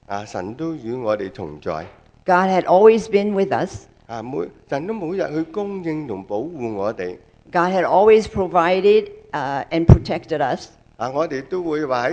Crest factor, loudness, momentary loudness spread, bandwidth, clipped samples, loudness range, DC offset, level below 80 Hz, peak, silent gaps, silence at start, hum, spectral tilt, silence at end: 20 dB; -20 LUFS; 15 LU; 8.8 kHz; under 0.1%; 9 LU; under 0.1%; -36 dBFS; 0 dBFS; none; 0.1 s; none; -7.5 dB/octave; 0 s